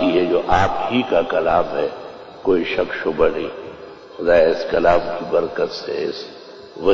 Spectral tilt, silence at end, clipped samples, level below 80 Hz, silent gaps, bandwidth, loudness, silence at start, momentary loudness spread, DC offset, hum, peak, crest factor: -6 dB/octave; 0 s; under 0.1%; -42 dBFS; none; 7.6 kHz; -19 LUFS; 0 s; 19 LU; under 0.1%; none; -4 dBFS; 16 dB